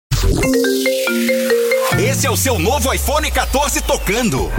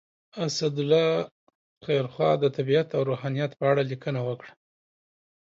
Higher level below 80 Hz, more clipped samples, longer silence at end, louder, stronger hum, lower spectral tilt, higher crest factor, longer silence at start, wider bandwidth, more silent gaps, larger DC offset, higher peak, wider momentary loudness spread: first, -24 dBFS vs -72 dBFS; neither; second, 0 s vs 0.95 s; first, -15 LUFS vs -26 LUFS; neither; second, -4 dB/octave vs -6 dB/octave; second, 10 dB vs 18 dB; second, 0.1 s vs 0.35 s; first, 17 kHz vs 7.8 kHz; second, none vs 1.32-1.47 s, 1.55-1.81 s; neither; first, -4 dBFS vs -10 dBFS; second, 2 LU vs 11 LU